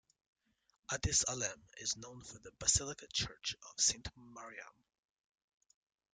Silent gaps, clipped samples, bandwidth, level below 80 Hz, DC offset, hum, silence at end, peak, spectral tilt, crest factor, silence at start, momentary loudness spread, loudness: none; under 0.1%; 11 kHz; -58 dBFS; under 0.1%; none; 1.45 s; -16 dBFS; -1 dB/octave; 26 dB; 0.9 s; 20 LU; -36 LUFS